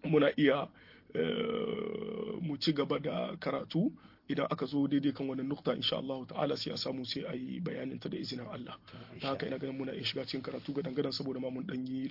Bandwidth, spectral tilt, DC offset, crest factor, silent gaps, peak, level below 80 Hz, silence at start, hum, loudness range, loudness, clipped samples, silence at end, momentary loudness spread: 5.8 kHz; -6.5 dB/octave; under 0.1%; 20 dB; none; -14 dBFS; -72 dBFS; 0.05 s; none; 5 LU; -35 LUFS; under 0.1%; 0 s; 9 LU